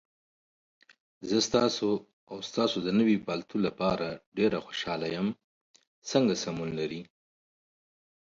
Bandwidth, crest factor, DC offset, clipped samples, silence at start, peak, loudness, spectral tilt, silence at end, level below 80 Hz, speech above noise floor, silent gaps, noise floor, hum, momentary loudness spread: 7.8 kHz; 20 dB; under 0.1%; under 0.1%; 1.2 s; -10 dBFS; -29 LUFS; -5 dB/octave; 1.25 s; -64 dBFS; over 61 dB; 2.13-2.27 s, 4.26-4.32 s, 5.44-5.74 s, 5.87-6.02 s; under -90 dBFS; none; 12 LU